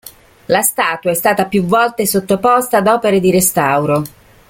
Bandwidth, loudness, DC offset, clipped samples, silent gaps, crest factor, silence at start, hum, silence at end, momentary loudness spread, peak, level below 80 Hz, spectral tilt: 17 kHz; -13 LUFS; under 0.1%; under 0.1%; none; 14 dB; 0.05 s; none; 0.4 s; 4 LU; 0 dBFS; -48 dBFS; -4 dB/octave